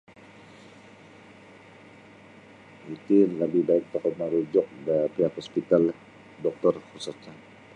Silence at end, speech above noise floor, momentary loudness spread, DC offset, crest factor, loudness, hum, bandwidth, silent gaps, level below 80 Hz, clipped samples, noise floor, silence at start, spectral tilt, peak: 0.4 s; 25 dB; 19 LU; under 0.1%; 20 dB; -26 LUFS; none; 10.5 kHz; none; -70 dBFS; under 0.1%; -50 dBFS; 2.85 s; -7.5 dB/octave; -6 dBFS